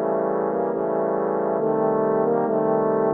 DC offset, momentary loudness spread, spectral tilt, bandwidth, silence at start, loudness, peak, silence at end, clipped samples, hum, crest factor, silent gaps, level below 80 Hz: under 0.1%; 3 LU; -12 dB/octave; 2.8 kHz; 0 s; -22 LUFS; -8 dBFS; 0 s; under 0.1%; none; 14 dB; none; -70 dBFS